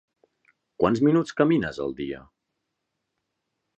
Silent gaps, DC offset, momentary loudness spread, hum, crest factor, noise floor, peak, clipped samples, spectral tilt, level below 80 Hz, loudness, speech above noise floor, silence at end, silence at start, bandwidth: none; under 0.1%; 13 LU; none; 20 dB; -81 dBFS; -6 dBFS; under 0.1%; -7.5 dB/octave; -56 dBFS; -24 LUFS; 58 dB; 1.6 s; 0.8 s; 8.2 kHz